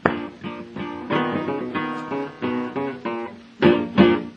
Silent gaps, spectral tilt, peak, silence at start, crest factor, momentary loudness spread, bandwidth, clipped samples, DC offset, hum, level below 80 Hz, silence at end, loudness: none; -8 dB/octave; 0 dBFS; 0.05 s; 22 dB; 15 LU; 6.6 kHz; under 0.1%; under 0.1%; none; -56 dBFS; 0 s; -23 LUFS